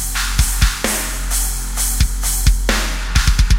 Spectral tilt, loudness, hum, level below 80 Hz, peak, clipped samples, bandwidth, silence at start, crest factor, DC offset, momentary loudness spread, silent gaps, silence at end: -2.5 dB/octave; -18 LUFS; none; -18 dBFS; 0 dBFS; under 0.1%; 16.5 kHz; 0 s; 16 dB; under 0.1%; 3 LU; none; 0 s